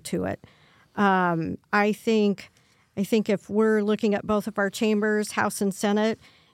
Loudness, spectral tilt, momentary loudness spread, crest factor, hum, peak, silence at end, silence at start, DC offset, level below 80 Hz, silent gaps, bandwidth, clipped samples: -24 LUFS; -5.5 dB/octave; 10 LU; 16 dB; none; -8 dBFS; 0.4 s; 0.05 s; under 0.1%; -64 dBFS; none; 15.5 kHz; under 0.1%